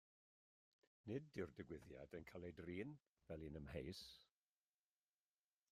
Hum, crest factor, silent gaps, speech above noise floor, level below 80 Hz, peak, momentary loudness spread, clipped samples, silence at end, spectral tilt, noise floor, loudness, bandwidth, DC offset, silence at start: none; 20 dB; 3.08-3.12 s; over 36 dB; -74 dBFS; -36 dBFS; 8 LU; under 0.1%; 1.45 s; -6.5 dB/octave; under -90 dBFS; -55 LUFS; 15 kHz; under 0.1%; 1.05 s